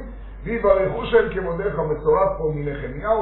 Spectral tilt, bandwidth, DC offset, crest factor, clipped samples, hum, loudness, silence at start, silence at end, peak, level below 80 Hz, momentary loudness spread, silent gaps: -5.5 dB/octave; 4.2 kHz; under 0.1%; 20 dB; under 0.1%; none; -21 LUFS; 0 s; 0 s; -2 dBFS; -36 dBFS; 10 LU; none